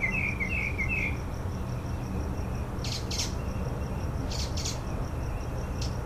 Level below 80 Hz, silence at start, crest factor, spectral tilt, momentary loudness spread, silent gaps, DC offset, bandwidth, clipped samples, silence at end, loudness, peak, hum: -36 dBFS; 0 s; 14 dB; -4.5 dB/octave; 6 LU; none; under 0.1%; 15.5 kHz; under 0.1%; 0 s; -32 LUFS; -16 dBFS; none